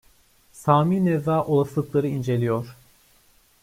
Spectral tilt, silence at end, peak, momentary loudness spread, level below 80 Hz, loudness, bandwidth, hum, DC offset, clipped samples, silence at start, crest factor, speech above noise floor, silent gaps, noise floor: -8.5 dB/octave; 0.9 s; -4 dBFS; 9 LU; -58 dBFS; -23 LUFS; 16 kHz; none; under 0.1%; under 0.1%; 0.55 s; 20 dB; 37 dB; none; -59 dBFS